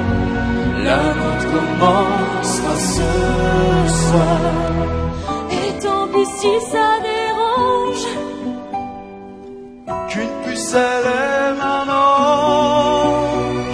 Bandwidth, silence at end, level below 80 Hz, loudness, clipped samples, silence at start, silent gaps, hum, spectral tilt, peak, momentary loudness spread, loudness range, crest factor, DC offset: 11 kHz; 0 s; -32 dBFS; -17 LUFS; under 0.1%; 0 s; none; none; -5 dB/octave; 0 dBFS; 12 LU; 6 LU; 16 dB; under 0.1%